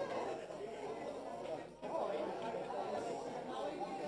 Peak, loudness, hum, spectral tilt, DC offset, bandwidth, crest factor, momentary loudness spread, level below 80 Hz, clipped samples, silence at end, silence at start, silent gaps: -28 dBFS; -43 LUFS; none; -5 dB/octave; under 0.1%; 11 kHz; 16 dB; 5 LU; -74 dBFS; under 0.1%; 0 s; 0 s; none